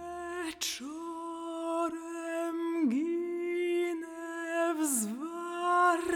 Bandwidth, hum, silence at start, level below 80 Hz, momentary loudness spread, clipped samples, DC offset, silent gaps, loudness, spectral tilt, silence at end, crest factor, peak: 18 kHz; none; 0 s; -72 dBFS; 10 LU; under 0.1%; under 0.1%; none; -33 LUFS; -2.5 dB/octave; 0 s; 18 dB; -14 dBFS